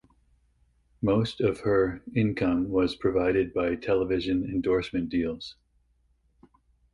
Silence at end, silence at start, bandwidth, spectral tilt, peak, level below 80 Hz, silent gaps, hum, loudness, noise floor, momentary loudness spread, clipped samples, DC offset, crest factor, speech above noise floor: 1.4 s; 1 s; 11 kHz; -7.5 dB/octave; -12 dBFS; -50 dBFS; none; none; -27 LUFS; -68 dBFS; 4 LU; under 0.1%; under 0.1%; 16 dB; 42 dB